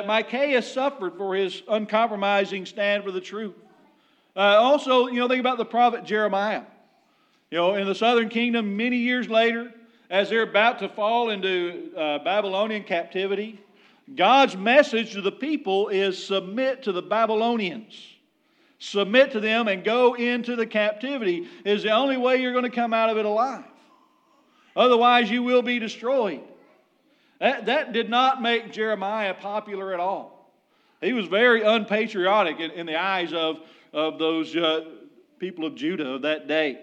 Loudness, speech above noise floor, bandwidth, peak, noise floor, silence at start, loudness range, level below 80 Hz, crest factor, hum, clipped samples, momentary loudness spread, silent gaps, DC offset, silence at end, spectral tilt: -23 LUFS; 41 dB; 9 kHz; -2 dBFS; -64 dBFS; 0 s; 4 LU; under -90 dBFS; 22 dB; none; under 0.1%; 12 LU; none; under 0.1%; 0 s; -5 dB/octave